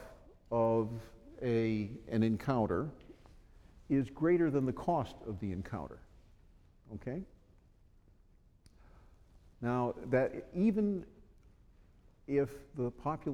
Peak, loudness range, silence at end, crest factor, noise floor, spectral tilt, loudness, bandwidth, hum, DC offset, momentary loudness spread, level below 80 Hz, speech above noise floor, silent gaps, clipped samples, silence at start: -18 dBFS; 14 LU; 0 s; 18 dB; -64 dBFS; -9 dB/octave; -35 LUFS; 12 kHz; none; under 0.1%; 17 LU; -58 dBFS; 30 dB; none; under 0.1%; 0 s